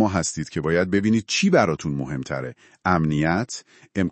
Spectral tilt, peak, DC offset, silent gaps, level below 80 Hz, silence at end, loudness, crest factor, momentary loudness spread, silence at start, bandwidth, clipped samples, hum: -5 dB/octave; -2 dBFS; under 0.1%; none; -52 dBFS; 0 s; -22 LUFS; 20 dB; 12 LU; 0 s; 8.8 kHz; under 0.1%; none